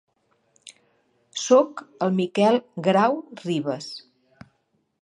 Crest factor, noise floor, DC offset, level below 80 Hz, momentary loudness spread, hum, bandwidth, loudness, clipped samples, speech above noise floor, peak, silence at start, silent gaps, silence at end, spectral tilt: 20 dB; -70 dBFS; under 0.1%; -74 dBFS; 14 LU; none; 11 kHz; -22 LUFS; under 0.1%; 49 dB; -4 dBFS; 1.35 s; none; 1.05 s; -5.5 dB/octave